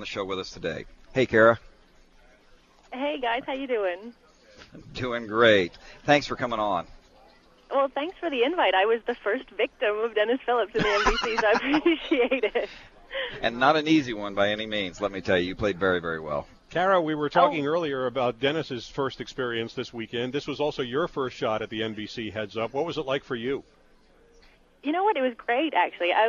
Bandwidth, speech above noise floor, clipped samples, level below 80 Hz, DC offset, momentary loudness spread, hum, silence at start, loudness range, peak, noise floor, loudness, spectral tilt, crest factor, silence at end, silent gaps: 7.4 kHz; 32 dB; under 0.1%; -50 dBFS; under 0.1%; 11 LU; none; 0 s; 6 LU; -6 dBFS; -58 dBFS; -26 LUFS; -5 dB/octave; 22 dB; 0 s; none